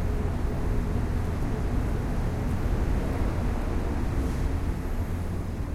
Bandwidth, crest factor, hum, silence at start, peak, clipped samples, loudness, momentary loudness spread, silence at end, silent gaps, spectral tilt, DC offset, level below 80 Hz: 15 kHz; 12 dB; none; 0 s; -14 dBFS; under 0.1%; -30 LUFS; 3 LU; 0 s; none; -7.5 dB/octave; under 0.1%; -30 dBFS